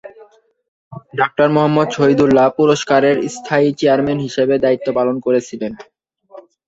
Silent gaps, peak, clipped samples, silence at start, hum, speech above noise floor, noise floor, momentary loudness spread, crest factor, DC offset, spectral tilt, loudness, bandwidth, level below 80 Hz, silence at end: 0.68-0.91 s; 0 dBFS; under 0.1%; 0.05 s; none; 33 dB; -47 dBFS; 7 LU; 16 dB; under 0.1%; -6 dB/octave; -15 LUFS; 8 kHz; -52 dBFS; 0.3 s